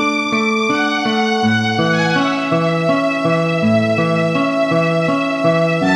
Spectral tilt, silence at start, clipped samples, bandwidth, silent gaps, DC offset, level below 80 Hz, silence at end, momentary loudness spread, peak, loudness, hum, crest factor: -6 dB/octave; 0 s; under 0.1%; 10.5 kHz; none; under 0.1%; -58 dBFS; 0 s; 1 LU; -4 dBFS; -15 LUFS; none; 12 dB